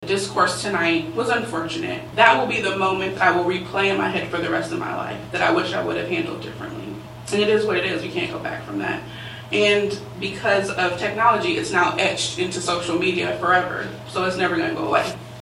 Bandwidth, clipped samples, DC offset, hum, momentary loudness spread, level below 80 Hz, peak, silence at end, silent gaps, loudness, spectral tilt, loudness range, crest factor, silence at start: 15.5 kHz; under 0.1%; under 0.1%; none; 11 LU; -54 dBFS; 0 dBFS; 0 s; none; -21 LUFS; -4 dB/octave; 4 LU; 22 dB; 0 s